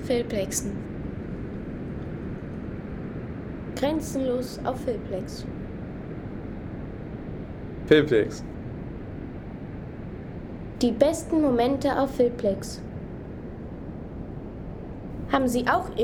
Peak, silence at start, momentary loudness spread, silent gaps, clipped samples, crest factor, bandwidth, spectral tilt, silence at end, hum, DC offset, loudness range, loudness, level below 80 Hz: -6 dBFS; 0 s; 15 LU; none; under 0.1%; 22 dB; 18.5 kHz; -5.5 dB/octave; 0 s; none; under 0.1%; 8 LU; -29 LUFS; -44 dBFS